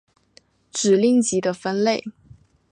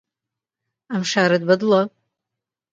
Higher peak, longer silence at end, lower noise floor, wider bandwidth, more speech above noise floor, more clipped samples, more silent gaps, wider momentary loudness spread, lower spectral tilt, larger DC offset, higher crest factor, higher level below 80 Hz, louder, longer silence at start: about the same, -6 dBFS vs -4 dBFS; second, 0.6 s vs 0.85 s; second, -57 dBFS vs -86 dBFS; first, 10.5 kHz vs 9 kHz; second, 38 dB vs 68 dB; neither; neither; about the same, 12 LU vs 11 LU; about the same, -4.5 dB/octave vs -5 dB/octave; neither; about the same, 16 dB vs 18 dB; about the same, -64 dBFS vs -68 dBFS; about the same, -20 LUFS vs -19 LUFS; second, 0.75 s vs 0.9 s